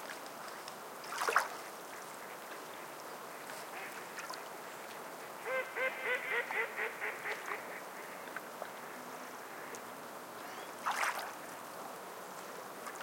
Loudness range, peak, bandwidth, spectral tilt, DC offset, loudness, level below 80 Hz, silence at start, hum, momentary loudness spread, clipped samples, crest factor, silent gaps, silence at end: 8 LU; -14 dBFS; 17 kHz; -1.5 dB/octave; under 0.1%; -41 LUFS; under -90 dBFS; 0 s; none; 12 LU; under 0.1%; 28 dB; none; 0 s